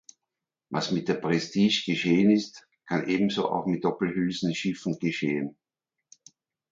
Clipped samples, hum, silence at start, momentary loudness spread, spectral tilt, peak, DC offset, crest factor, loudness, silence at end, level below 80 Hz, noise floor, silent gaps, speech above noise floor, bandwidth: under 0.1%; none; 0.7 s; 9 LU; -5.5 dB/octave; -10 dBFS; under 0.1%; 18 dB; -26 LUFS; 1.2 s; -66 dBFS; -87 dBFS; none; 61 dB; 7.6 kHz